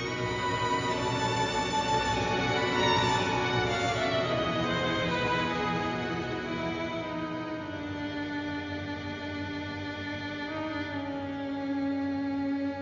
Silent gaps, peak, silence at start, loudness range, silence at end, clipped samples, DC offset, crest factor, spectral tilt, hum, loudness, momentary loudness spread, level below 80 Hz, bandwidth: none; -14 dBFS; 0 s; 8 LU; 0 s; under 0.1%; under 0.1%; 16 dB; -5 dB/octave; none; -30 LUFS; 8 LU; -50 dBFS; 7.6 kHz